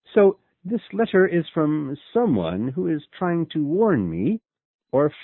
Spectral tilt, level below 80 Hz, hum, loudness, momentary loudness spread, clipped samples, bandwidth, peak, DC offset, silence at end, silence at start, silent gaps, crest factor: -12 dB/octave; -54 dBFS; none; -22 LUFS; 9 LU; under 0.1%; 4.2 kHz; -6 dBFS; under 0.1%; 0 s; 0.15 s; 4.65-4.79 s; 16 dB